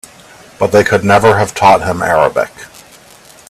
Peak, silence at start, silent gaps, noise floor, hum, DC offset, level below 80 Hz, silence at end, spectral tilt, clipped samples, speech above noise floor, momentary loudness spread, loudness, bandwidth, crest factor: 0 dBFS; 0.6 s; none; -40 dBFS; none; under 0.1%; -44 dBFS; 0.85 s; -5 dB/octave; under 0.1%; 30 dB; 9 LU; -11 LUFS; 15 kHz; 12 dB